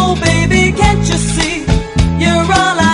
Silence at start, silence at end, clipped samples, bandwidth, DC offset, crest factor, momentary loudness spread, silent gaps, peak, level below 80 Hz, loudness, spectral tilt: 0 s; 0 s; under 0.1%; 11 kHz; under 0.1%; 12 dB; 5 LU; none; 0 dBFS; -20 dBFS; -12 LUFS; -4.5 dB/octave